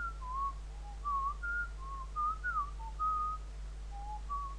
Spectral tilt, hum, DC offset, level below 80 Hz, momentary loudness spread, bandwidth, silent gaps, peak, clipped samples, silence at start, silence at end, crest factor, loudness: -4.5 dB/octave; none; under 0.1%; -44 dBFS; 12 LU; 10.5 kHz; none; -26 dBFS; under 0.1%; 0 s; 0 s; 12 dB; -39 LUFS